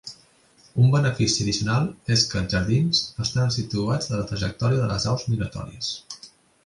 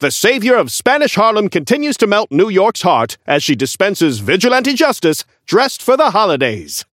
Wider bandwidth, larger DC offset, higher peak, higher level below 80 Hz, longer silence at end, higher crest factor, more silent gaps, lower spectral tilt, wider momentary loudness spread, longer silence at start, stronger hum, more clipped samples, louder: second, 11.5 kHz vs 16.5 kHz; neither; second, -4 dBFS vs 0 dBFS; first, -44 dBFS vs -60 dBFS; first, 0.4 s vs 0.1 s; about the same, 18 dB vs 14 dB; neither; about the same, -5 dB/octave vs -4 dB/octave; first, 10 LU vs 4 LU; about the same, 0.05 s vs 0 s; neither; neither; second, -23 LUFS vs -13 LUFS